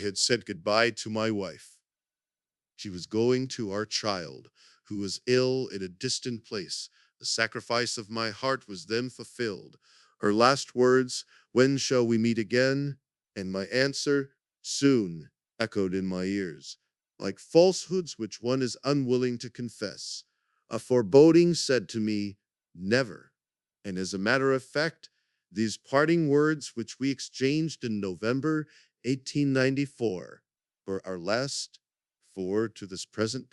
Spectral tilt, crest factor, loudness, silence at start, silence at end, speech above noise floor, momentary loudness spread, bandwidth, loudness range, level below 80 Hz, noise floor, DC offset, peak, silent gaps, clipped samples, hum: -4.5 dB/octave; 24 dB; -28 LUFS; 0 s; 0.1 s; over 62 dB; 15 LU; 12 kHz; 6 LU; -72 dBFS; under -90 dBFS; under 0.1%; -4 dBFS; none; under 0.1%; none